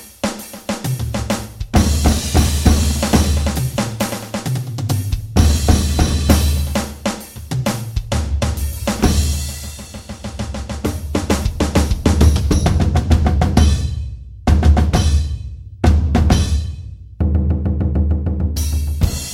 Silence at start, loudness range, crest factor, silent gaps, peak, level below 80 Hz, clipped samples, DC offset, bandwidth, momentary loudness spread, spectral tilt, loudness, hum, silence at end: 0 s; 5 LU; 16 dB; none; 0 dBFS; -20 dBFS; under 0.1%; under 0.1%; 16 kHz; 12 LU; -5.5 dB/octave; -18 LUFS; none; 0 s